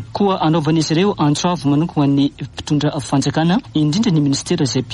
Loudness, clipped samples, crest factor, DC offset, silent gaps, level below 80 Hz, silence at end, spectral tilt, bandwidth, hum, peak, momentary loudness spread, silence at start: -17 LUFS; under 0.1%; 12 dB; under 0.1%; none; -46 dBFS; 0 s; -6 dB/octave; 11.5 kHz; none; -4 dBFS; 3 LU; 0 s